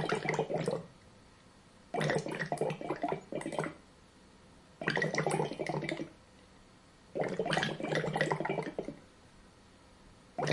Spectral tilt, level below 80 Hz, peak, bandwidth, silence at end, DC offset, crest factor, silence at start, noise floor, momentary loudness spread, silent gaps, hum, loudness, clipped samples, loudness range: -5 dB/octave; -66 dBFS; -14 dBFS; 11.5 kHz; 0 s; under 0.1%; 24 dB; 0 s; -59 dBFS; 11 LU; none; none; -35 LUFS; under 0.1%; 2 LU